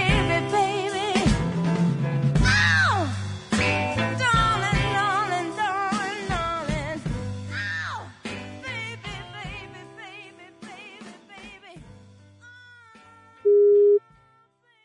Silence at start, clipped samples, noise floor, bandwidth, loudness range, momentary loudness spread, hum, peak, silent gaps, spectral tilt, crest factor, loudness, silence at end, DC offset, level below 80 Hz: 0 s; under 0.1%; -62 dBFS; 11 kHz; 19 LU; 23 LU; none; -6 dBFS; none; -5.5 dB/octave; 18 dB; -23 LUFS; 0.85 s; under 0.1%; -38 dBFS